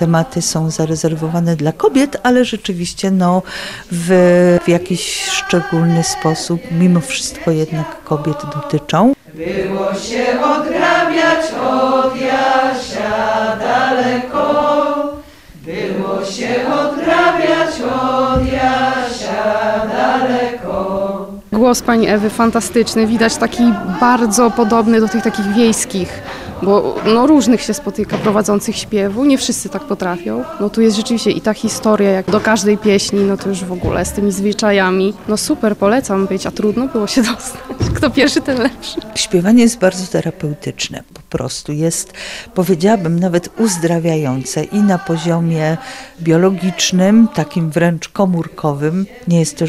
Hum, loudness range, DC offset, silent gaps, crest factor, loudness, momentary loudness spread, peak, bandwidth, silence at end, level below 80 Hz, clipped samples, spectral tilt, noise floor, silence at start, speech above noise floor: none; 3 LU; 0.3%; none; 14 dB; -15 LUFS; 9 LU; 0 dBFS; 15.5 kHz; 0 s; -40 dBFS; under 0.1%; -5 dB/octave; -36 dBFS; 0 s; 22 dB